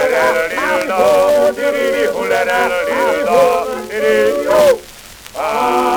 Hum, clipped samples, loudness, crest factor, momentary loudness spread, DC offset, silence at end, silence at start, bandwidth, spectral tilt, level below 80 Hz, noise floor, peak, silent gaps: none; under 0.1%; -14 LUFS; 12 dB; 8 LU; under 0.1%; 0 s; 0 s; over 20 kHz; -3 dB/octave; -46 dBFS; -36 dBFS; 0 dBFS; none